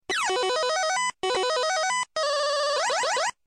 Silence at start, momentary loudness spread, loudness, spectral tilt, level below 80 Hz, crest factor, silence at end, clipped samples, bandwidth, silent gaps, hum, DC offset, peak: 0.1 s; 2 LU; -25 LUFS; 0.5 dB/octave; -68 dBFS; 10 dB; 0.15 s; under 0.1%; 14 kHz; none; none; under 0.1%; -16 dBFS